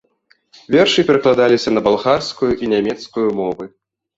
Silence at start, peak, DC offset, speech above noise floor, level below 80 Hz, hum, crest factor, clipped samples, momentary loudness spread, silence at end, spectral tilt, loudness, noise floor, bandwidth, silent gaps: 0.7 s; -2 dBFS; under 0.1%; 44 dB; -50 dBFS; none; 16 dB; under 0.1%; 9 LU; 0.5 s; -5 dB/octave; -16 LUFS; -59 dBFS; 8 kHz; none